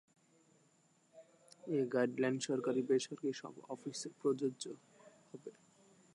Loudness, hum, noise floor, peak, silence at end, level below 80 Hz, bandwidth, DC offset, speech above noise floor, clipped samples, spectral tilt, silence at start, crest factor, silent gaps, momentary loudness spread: -38 LUFS; none; -73 dBFS; -22 dBFS; 0.65 s; under -90 dBFS; 11 kHz; under 0.1%; 35 dB; under 0.1%; -5 dB/octave; 1.15 s; 20 dB; none; 19 LU